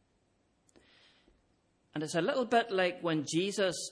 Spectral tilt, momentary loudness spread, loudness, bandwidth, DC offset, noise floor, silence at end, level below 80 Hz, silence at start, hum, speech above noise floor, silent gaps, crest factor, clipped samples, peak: -4 dB/octave; 7 LU; -32 LUFS; 11 kHz; under 0.1%; -74 dBFS; 0 s; -76 dBFS; 1.95 s; none; 42 dB; none; 20 dB; under 0.1%; -14 dBFS